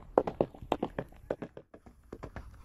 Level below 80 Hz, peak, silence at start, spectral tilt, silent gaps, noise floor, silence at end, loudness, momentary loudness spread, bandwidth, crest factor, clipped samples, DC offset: -54 dBFS; -6 dBFS; 0 s; -7.5 dB/octave; none; -57 dBFS; 0 s; -37 LUFS; 21 LU; 13.5 kHz; 32 dB; under 0.1%; under 0.1%